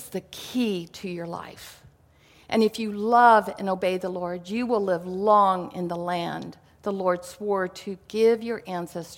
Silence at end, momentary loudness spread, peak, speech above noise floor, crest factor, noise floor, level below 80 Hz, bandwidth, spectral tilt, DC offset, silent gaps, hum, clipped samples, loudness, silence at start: 0 s; 16 LU; -4 dBFS; 32 dB; 22 dB; -57 dBFS; -64 dBFS; 17 kHz; -5.5 dB/octave; under 0.1%; none; none; under 0.1%; -25 LUFS; 0 s